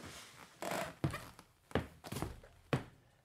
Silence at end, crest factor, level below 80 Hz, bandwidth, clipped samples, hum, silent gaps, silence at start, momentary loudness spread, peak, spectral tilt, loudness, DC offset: 0.3 s; 24 dB; -60 dBFS; 16 kHz; under 0.1%; none; none; 0 s; 16 LU; -20 dBFS; -5.5 dB/octave; -43 LUFS; under 0.1%